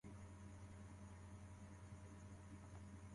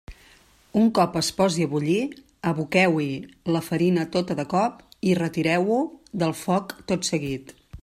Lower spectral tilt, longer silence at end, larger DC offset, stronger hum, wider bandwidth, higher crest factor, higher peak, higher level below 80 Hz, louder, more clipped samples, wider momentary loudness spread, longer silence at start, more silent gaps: about the same, -6.5 dB/octave vs -5.5 dB/octave; about the same, 0 s vs 0.05 s; neither; neither; second, 11.5 kHz vs 15 kHz; second, 12 dB vs 18 dB; second, -46 dBFS vs -6 dBFS; second, -66 dBFS vs -54 dBFS; second, -59 LUFS vs -24 LUFS; neither; second, 1 LU vs 8 LU; about the same, 0.05 s vs 0.1 s; neither